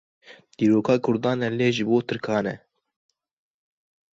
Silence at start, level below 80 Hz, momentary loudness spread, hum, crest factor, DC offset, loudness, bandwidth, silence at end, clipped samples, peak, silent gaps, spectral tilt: 0.3 s; -64 dBFS; 6 LU; none; 18 dB; under 0.1%; -23 LUFS; 7.8 kHz; 1.55 s; under 0.1%; -6 dBFS; none; -6.5 dB/octave